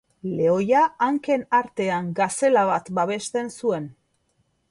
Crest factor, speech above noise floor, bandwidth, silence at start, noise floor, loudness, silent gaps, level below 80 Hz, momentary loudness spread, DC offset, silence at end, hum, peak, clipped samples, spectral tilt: 16 dB; 47 dB; 11.5 kHz; 0.25 s; -69 dBFS; -22 LUFS; none; -64 dBFS; 8 LU; under 0.1%; 0.8 s; none; -8 dBFS; under 0.1%; -5 dB/octave